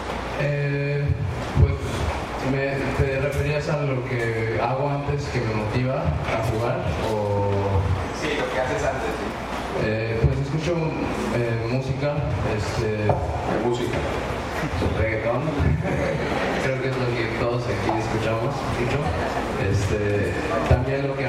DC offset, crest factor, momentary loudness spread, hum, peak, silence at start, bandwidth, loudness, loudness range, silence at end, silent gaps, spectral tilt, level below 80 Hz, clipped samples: under 0.1%; 18 dB; 3 LU; none; -6 dBFS; 0 s; 14.5 kHz; -24 LUFS; 1 LU; 0 s; none; -6.5 dB/octave; -34 dBFS; under 0.1%